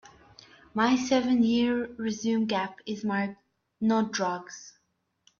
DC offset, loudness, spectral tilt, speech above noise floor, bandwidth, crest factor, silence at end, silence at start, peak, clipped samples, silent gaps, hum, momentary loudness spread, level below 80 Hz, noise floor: under 0.1%; -28 LUFS; -4.5 dB/octave; 49 dB; 7.2 kHz; 16 dB; 0.7 s; 0.75 s; -12 dBFS; under 0.1%; none; none; 12 LU; -66 dBFS; -76 dBFS